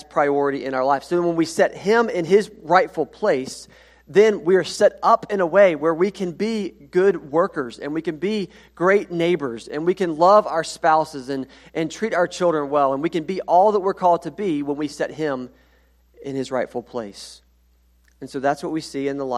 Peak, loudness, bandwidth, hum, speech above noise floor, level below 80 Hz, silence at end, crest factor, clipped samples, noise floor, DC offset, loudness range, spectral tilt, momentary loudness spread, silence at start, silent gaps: 0 dBFS; -20 LUFS; 13 kHz; none; 38 dB; -58 dBFS; 0 s; 20 dB; under 0.1%; -58 dBFS; under 0.1%; 9 LU; -5.5 dB/octave; 13 LU; 0.15 s; none